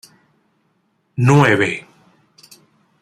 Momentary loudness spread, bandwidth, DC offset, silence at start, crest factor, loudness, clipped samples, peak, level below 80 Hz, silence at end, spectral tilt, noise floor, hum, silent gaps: 17 LU; 13 kHz; under 0.1%; 1.2 s; 18 dB; -15 LUFS; under 0.1%; -2 dBFS; -56 dBFS; 1.2 s; -6.5 dB/octave; -64 dBFS; none; none